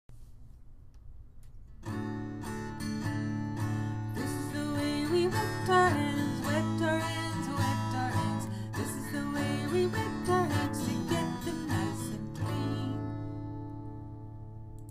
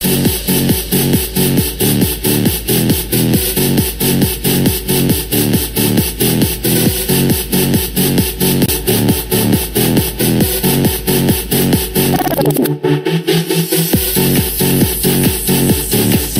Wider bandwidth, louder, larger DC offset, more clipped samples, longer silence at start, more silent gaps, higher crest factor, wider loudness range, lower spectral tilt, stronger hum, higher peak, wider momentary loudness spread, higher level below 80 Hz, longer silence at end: about the same, 15.5 kHz vs 16.5 kHz; second, -32 LUFS vs -13 LUFS; neither; neither; about the same, 0.1 s vs 0 s; neither; about the same, 18 dB vs 14 dB; first, 7 LU vs 0 LU; first, -6 dB/octave vs -4.5 dB/octave; neither; second, -14 dBFS vs 0 dBFS; first, 12 LU vs 2 LU; second, -52 dBFS vs -28 dBFS; about the same, 0 s vs 0 s